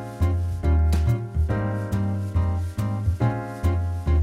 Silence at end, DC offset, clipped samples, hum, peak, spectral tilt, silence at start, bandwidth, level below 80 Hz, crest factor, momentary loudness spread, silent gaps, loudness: 0 s; under 0.1%; under 0.1%; none; -10 dBFS; -8 dB/octave; 0 s; 12.5 kHz; -28 dBFS; 14 dB; 4 LU; none; -25 LUFS